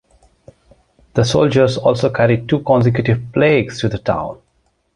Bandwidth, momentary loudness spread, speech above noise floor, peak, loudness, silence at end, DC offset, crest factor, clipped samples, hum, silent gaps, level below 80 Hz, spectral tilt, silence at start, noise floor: 11 kHz; 7 LU; 48 dB; -2 dBFS; -16 LUFS; 0.6 s; under 0.1%; 14 dB; under 0.1%; none; none; -42 dBFS; -6.5 dB/octave; 1.15 s; -62 dBFS